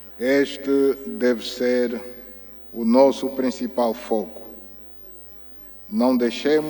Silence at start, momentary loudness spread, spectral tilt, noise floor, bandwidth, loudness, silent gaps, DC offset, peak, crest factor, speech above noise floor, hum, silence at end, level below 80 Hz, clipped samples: 0 s; 20 LU; -5 dB/octave; -41 dBFS; over 20 kHz; -21 LUFS; none; under 0.1%; -2 dBFS; 20 dB; 21 dB; 50 Hz at -75 dBFS; 0 s; -56 dBFS; under 0.1%